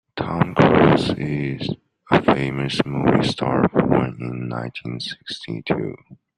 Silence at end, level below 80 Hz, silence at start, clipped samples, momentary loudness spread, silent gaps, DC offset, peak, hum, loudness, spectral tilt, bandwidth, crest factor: 0.25 s; -48 dBFS; 0.15 s; under 0.1%; 14 LU; none; under 0.1%; -2 dBFS; none; -20 LUFS; -7 dB/octave; 11 kHz; 18 dB